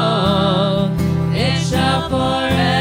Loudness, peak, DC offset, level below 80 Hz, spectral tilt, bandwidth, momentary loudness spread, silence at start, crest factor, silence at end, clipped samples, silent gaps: -16 LUFS; -4 dBFS; under 0.1%; -38 dBFS; -6 dB/octave; 16 kHz; 3 LU; 0 s; 12 dB; 0 s; under 0.1%; none